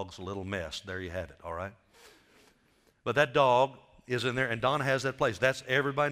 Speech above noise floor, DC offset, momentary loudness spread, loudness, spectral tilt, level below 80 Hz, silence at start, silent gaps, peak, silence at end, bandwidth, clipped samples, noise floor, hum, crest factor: 38 dB; under 0.1%; 15 LU; -30 LUFS; -5 dB/octave; -62 dBFS; 0 s; none; -10 dBFS; 0 s; 15.5 kHz; under 0.1%; -68 dBFS; none; 22 dB